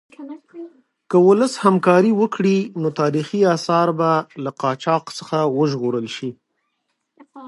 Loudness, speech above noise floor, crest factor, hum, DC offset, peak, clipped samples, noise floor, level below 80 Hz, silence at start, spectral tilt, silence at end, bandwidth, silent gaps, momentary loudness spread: -18 LUFS; 55 dB; 18 dB; none; under 0.1%; 0 dBFS; under 0.1%; -73 dBFS; -72 dBFS; 0.2 s; -6.5 dB/octave; 0 s; 11.5 kHz; none; 17 LU